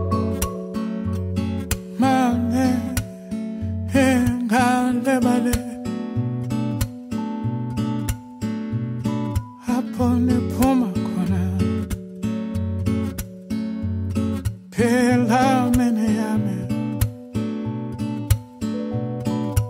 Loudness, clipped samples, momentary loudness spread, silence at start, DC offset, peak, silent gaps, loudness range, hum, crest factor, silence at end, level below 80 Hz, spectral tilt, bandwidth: -22 LUFS; under 0.1%; 10 LU; 0 s; under 0.1%; -4 dBFS; none; 6 LU; none; 18 dB; 0 s; -38 dBFS; -6.5 dB/octave; 16 kHz